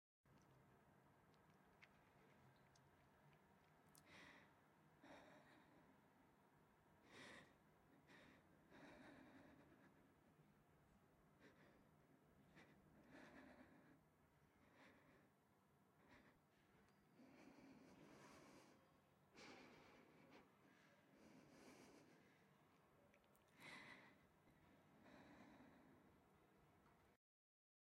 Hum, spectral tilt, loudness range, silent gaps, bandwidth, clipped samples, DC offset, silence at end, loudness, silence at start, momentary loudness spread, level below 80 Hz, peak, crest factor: none; -4.5 dB/octave; 2 LU; none; 11.5 kHz; under 0.1%; under 0.1%; 0.8 s; -67 LUFS; 0.25 s; 6 LU; under -90 dBFS; -48 dBFS; 24 dB